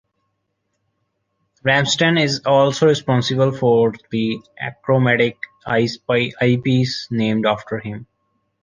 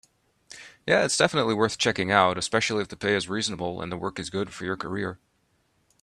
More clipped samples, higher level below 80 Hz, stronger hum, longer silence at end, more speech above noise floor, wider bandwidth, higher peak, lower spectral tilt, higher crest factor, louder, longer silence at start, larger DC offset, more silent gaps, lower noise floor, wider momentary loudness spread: neither; about the same, -56 dBFS vs -60 dBFS; neither; second, 0.6 s vs 0.85 s; first, 55 dB vs 44 dB; second, 9.6 kHz vs 13 kHz; about the same, -2 dBFS vs -2 dBFS; first, -5.5 dB/octave vs -3.5 dB/octave; second, 16 dB vs 24 dB; first, -18 LUFS vs -25 LUFS; first, 1.65 s vs 0.5 s; neither; neither; about the same, -72 dBFS vs -69 dBFS; about the same, 12 LU vs 11 LU